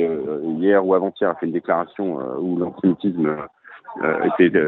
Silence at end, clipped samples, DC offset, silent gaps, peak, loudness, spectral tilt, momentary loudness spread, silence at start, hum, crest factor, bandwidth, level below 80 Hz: 0 s; under 0.1%; under 0.1%; none; -2 dBFS; -21 LUFS; -6 dB/octave; 9 LU; 0 s; none; 18 dB; 4.1 kHz; -64 dBFS